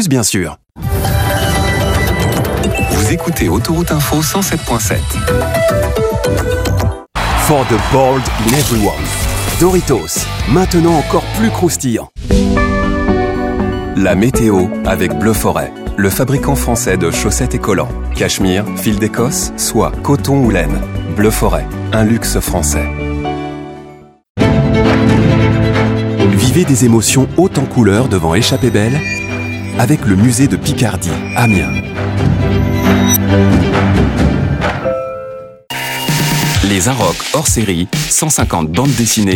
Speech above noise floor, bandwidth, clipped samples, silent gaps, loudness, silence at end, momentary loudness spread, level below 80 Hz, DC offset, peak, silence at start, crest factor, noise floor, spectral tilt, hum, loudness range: 24 dB; 17.5 kHz; under 0.1%; 24.30-24.35 s; -13 LUFS; 0 s; 7 LU; -24 dBFS; under 0.1%; 0 dBFS; 0 s; 12 dB; -36 dBFS; -5 dB/octave; none; 3 LU